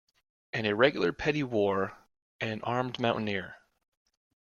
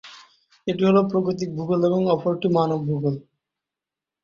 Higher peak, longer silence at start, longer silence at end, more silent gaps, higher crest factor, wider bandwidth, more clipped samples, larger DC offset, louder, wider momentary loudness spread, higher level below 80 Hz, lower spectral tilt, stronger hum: second, -10 dBFS vs -6 dBFS; first, 0.55 s vs 0.05 s; about the same, 1 s vs 1 s; first, 2.22-2.39 s vs none; first, 22 dB vs 16 dB; about the same, 7.2 kHz vs 7.2 kHz; neither; neither; second, -30 LUFS vs -22 LUFS; first, 12 LU vs 9 LU; about the same, -62 dBFS vs -62 dBFS; second, -6 dB/octave vs -8 dB/octave; neither